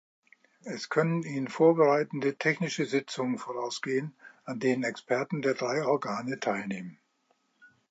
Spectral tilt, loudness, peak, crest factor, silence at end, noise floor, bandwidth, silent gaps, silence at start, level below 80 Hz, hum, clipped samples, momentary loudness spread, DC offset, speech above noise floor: -5.5 dB/octave; -29 LUFS; -10 dBFS; 20 dB; 0.25 s; -73 dBFS; 8.6 kHz; none; 0.65 s; -80 dBFS; none; under 0.1%; 15 LU; under 0.1%; 44 dB